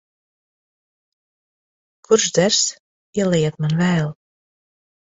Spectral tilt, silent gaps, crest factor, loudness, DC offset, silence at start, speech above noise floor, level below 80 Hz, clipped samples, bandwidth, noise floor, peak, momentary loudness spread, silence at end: -4 dB/octave; 2.79-3.13 s; 22 dB; -18 LUFS; under 0.1%; 2.1 s; over 72 dB; -58 dBFS; under 0.1%; 8 kHz; under -90 dBFS; -2 dBFS; 7 LU; 1 s